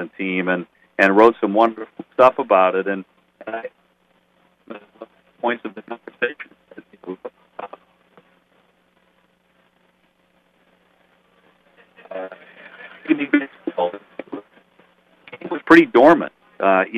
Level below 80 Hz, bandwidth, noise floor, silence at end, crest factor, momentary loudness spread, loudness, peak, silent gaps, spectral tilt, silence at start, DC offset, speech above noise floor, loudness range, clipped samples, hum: -64 dBFS; 8 kHz; -62 dBFS; 0 s; 22 dB; 25 LU; -18 LUFS; 0 dBFS; none; -6.5 dB/octave; 0 s; under 0.1%; 45 dB; 23 LU; under 0.1%; none